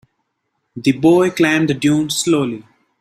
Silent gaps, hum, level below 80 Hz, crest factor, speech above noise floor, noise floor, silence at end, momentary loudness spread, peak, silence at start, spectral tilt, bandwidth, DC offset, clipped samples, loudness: none; none; -56 dBFS; 16 dB; 57 dB; -71 dBFS; 0.4 s; 8 LU; -2 dBFS; 0.75 s; -5 dB/octave; 15.5 kHz; under 0.1%; under 0.1%; -15 LUFS